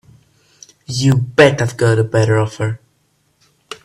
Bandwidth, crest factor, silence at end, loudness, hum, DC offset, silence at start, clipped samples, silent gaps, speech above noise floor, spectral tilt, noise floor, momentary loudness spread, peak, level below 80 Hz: 12.5 kHz; 16 dB; 0.1 s; -15 LUFS; none; under 0.1%; 0.9 s; under 0.1%; none; 47 dB; -6 dB/octave; -61 dBFS; 13 LU; 0 dBFS; -48 dBFS